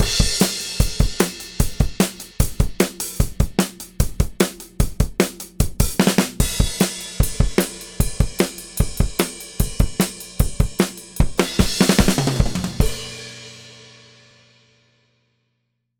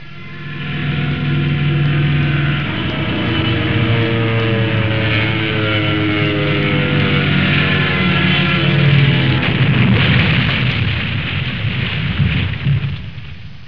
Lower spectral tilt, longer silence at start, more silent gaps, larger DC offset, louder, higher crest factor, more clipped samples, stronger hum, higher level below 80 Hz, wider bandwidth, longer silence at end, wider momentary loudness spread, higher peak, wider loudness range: second, -4.5 dB/octave vs -8.5 dB/octave; about the same, 0 s vs 0 s; neither; second, under 0.1% vs 2%; second, -21 LUFS vs -15 LUFS; first, 20 dB vs 14 dB; neither; neither; first, -26 dBFS vs -34 dBFS; first, over 20 kHz vs 5.4 kHz; first, 2.25 s vs 0 s; about the same, 8 LU vs 7 LU; about the same, 0 dBFS vs 0 dBFS; about the same, 3 LU vs 4 LU